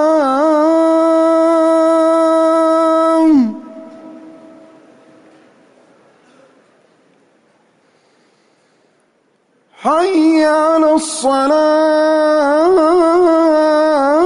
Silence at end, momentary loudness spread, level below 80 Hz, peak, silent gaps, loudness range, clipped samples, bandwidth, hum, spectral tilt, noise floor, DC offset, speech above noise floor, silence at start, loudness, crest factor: 0 s; 4 LU; -58 dBFS; -4 dBFS; none; 8 LU; under 0.1%; 11 kHz; none; -4 dB/octave; -58 dBFS; under 0.1%; 46 dB; 0 s; -12 LUFS; 10 dB